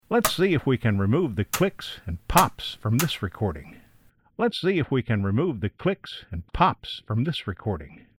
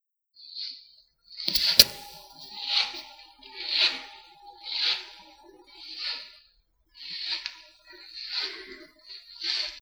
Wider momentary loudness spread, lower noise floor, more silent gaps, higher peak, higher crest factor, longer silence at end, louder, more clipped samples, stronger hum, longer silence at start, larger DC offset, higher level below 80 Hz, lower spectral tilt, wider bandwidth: second, 13 LU vs 24 LU; second, -59 dBFS vs -66 dBFS; neither; second, -4 dBFS vs 0 dBFS; second, 22 dB vs 32 dB; first, 0.25 s vs 0 s; about the same, -25 LUFS vs -26 LUFS; neither; neither; second, 0.1 s vs 0.4 s; neither; first, -44 dBFS vs -60 dBFS; first, -5.5 dB/octave vs 0.5 dB/octave; about the same, over 20 kHz vs over 20 kHz